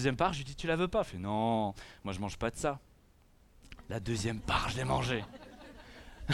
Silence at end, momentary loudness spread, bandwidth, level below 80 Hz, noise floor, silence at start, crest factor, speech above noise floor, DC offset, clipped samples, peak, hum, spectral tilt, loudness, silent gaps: 0 s; 20 LU; 15 kHz; -50 dBFS; -63 dBFS; 0 s; 20 dB; 29 dB; under 0.1%; under 0.1%; -16 dBFS; none; -5.5 dB/octave; -34 LUFS; none